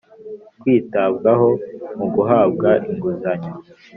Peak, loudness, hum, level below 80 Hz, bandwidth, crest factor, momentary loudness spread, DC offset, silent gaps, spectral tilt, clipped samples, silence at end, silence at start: -2 dBFS; -18 LUFS; none; -58 dBFS; 5 kHz; 16 dB; 20 LU; under 0.1%; none; -7.5 dB/octave; under 0.1%; 0 s; 0.2 s